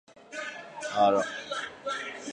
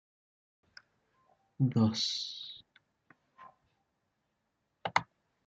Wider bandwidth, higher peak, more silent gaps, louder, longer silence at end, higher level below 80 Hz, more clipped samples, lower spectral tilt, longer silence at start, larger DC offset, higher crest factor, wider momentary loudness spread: first, 10 kHz vs 8 kHz; about the same, -12 dBFS vs -12 dBFS; neither; first, -30 LUFS vs -33 LUFS; second, 0 s vs 0.45 s; first, -72 dBFS vs -78 dBFS; neither; second, -3 dB/octave vs -5 dB/octave; second, 0.1 s vs 1.6 s; neither; second, 18 dB vs 26 dB; about the same, 14 LU vs 16 LU